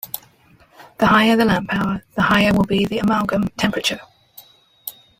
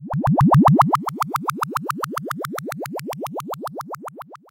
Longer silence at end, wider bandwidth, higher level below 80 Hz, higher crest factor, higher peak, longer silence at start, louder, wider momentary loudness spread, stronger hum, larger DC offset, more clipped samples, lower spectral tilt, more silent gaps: first, 0.3 s vs 0.15 s; about the same, 16.5 kHz vs 17 kHz; about the same, -44 dBFS vs -46 dBFS; about the same, 16 dB vs 18 dB; about the same, -4 dBFS vs -4 dBFS; about the same, 0.05 s vs 0 s; first, -17 LUFS vs -21 LUFS; about the same, 18 LU vs 19 LU; neither; neither; neither; second, -5.5 dB/octave vs -7 dB/octave; neither